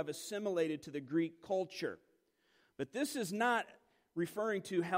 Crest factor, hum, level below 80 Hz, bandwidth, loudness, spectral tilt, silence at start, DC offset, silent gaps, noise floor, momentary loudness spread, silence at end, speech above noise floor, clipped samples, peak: 18 dB; none; -82 dBFS; 16 kHz; -38 LUFS; -4.5 dB/octave; 0 s; under 0.1%; none; -75 dBFS; 10 LU; 0 s; 38 dB; under 0.1%; -22 dBFS